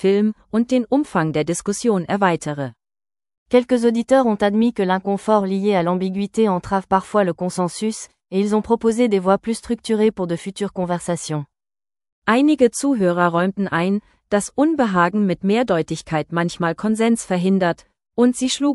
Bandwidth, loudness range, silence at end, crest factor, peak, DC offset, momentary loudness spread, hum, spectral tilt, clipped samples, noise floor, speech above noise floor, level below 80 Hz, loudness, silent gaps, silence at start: 12 kHz; 2 LU; 0 s; 18 dB; -2 dBFS; under 0.1%; 8 LU; none; -5.5 dB/octave; under 0.1%; under -90 dBFS; over 72 dB; -54 dBFS; -19 LUFS; 3.38-3.46 s, 12.12-12.22 s; 0 s